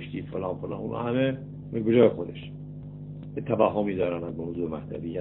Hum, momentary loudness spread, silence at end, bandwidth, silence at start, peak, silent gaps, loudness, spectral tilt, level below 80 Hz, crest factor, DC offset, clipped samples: 50 Hz at -45 dBFS; 18 LU; 0 s; 4.1 kHz; 0 s; -6 dBFS; none; -28 LUFS; -11.5 dB/octave; -52 dBFS; 20 dB; under 0.1%; under 0.1%